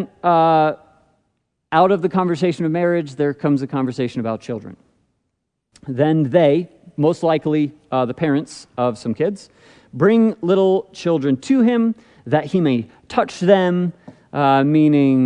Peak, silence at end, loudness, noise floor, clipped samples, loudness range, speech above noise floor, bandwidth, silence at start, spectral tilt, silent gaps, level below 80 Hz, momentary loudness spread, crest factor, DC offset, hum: 0 dBFS; 0 s; -18 LUFS; -74 dBFS; under 0.1%; 4 LU; 57 dB; 10 kHz; 0 s; -7.5 dB/octave; none; -62 dBFS; 10 LU; 18 dB; under 0.1%; none